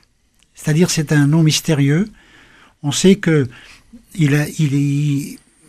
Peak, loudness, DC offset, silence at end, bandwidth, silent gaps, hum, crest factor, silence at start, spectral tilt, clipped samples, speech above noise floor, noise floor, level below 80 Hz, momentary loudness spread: 0 dBFS; -16 LUFS; under 0.1%; 0.35 s; 15 kHz; none; none; 16 dB; 0.6 s; -5.5 dB/octave; under 0.1%; 43 dB; -58 dBFS; -48 dBFS; 13 LU